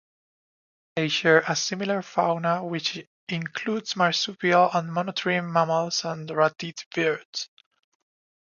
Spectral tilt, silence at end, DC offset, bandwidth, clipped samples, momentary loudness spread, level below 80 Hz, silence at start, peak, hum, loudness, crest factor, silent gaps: -4 dB/octave; 0.95 s; under 0.1%; 7.4 kHz; under 0.1%; 12 LU; -74 dBFS; 0.95 s; -4 dBFS; none; -25 LUFS; 22 dB; 3.07-3.27 s, 6.86-6.91 s, 7.25-7.33 s